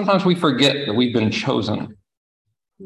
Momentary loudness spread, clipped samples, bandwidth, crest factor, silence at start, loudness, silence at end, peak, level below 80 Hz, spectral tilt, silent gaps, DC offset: 10 LU; under 0.1%; 12 kHz; 18 dB; 0 s; -19 LUFS; 0 s; -2 dBFS; -54 dBFS; -5.5 dB/octave; 2.17-2.45 s; under 0.1%